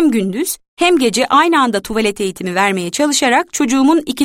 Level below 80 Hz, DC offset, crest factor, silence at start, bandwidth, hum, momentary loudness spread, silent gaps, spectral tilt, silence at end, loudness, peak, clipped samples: -50 dBFS; under 0.1%; 12 dB; 0 s; 16.5 kHz; none; 7 LU; 0.68-0.77 s; -3.5 dB/octave; 0 s; -14 LUFS; -2 dBFS; under 0.1%